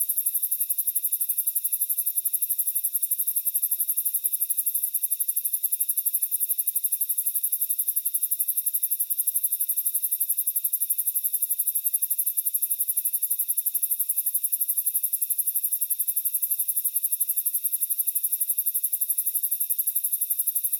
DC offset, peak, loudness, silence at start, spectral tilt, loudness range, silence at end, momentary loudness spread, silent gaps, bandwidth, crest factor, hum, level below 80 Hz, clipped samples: under 0.1%; -8 dBFS; -23 LUFS; 0 s; 11 dB/octave; 0 LU; 0 s; 1 LU; none; 19.5 kHz; 18 dB; none; under -90 dBFS; under 0.1%